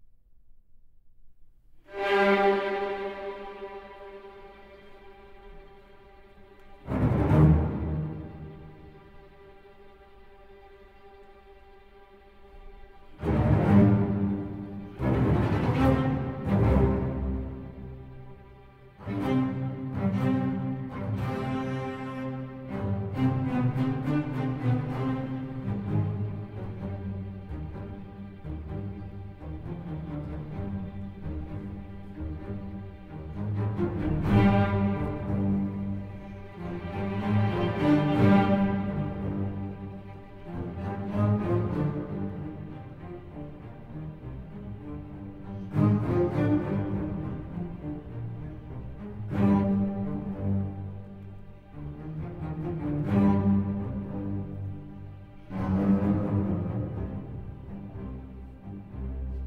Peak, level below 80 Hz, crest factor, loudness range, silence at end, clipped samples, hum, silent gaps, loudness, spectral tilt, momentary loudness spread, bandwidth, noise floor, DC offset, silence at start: -8 dBFS; -42 dBFS; 22 dB; 12 LU; 0 s; under 0.1%; none; none; -29 LUFS; -9.5 dB/octave; 19 LU; 6.4 kHz; -53 dBFS; under 0.1%; 0 s